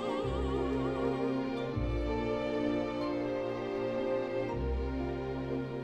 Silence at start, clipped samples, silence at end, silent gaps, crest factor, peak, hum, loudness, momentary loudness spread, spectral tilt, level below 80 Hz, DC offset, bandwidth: 0 s; under 0.1%; 0 s; none; 14 dB; -20 dBFS; none; -34 LUFS; 3 LU; -8 dB/octave; -42 dBFS; under 0.1%; 8.8 kHz